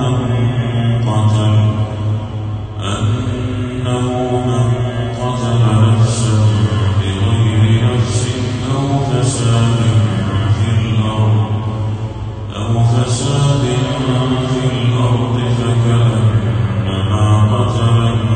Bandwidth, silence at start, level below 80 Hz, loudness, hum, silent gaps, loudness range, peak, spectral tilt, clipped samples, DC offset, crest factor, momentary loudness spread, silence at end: 9.6 kHz; 0 s; -34 dBFS; -15 LUFS; none; none; 3 LU; -2 dBFS; -6.5 dB/octave; under 0.1%; under 0.1%; 12 dB; 7 LU; 0 s